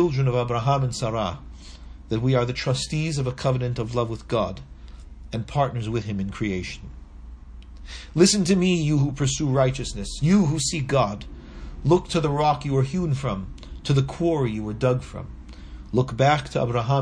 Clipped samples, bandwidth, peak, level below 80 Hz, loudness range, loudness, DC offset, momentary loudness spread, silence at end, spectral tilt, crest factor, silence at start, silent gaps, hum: under 0.1%; 10.5 kHz; -4 dBFS; -40 dBFS; 6 LU; -23 LUFS; under 0.1%; 20 LU; 0 s; -5.5 dB/octave; 20 dB; 0 s; none; none